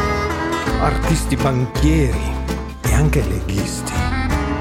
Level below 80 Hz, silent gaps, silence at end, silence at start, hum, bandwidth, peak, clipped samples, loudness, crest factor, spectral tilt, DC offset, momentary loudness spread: -22 dBFS; none; 0 s; 0 s; none; 16 kHz; -2 dBFS; under 0.1%; -19 LUFS; 16 dB; -5.5 dB/octave; under 0.1%; 6 LU